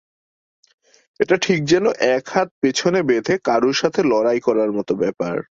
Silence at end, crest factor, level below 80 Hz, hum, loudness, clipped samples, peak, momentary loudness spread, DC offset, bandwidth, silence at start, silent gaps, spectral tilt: 0.15 s; 18 dB; -58 dBFS; none; -18 LUFS; under 0.1%; -2 dBFS; 5 LU; under 0.1%; 7.8 kHz; 1.2 s; 2.51-2.61 s; -5 dB/octave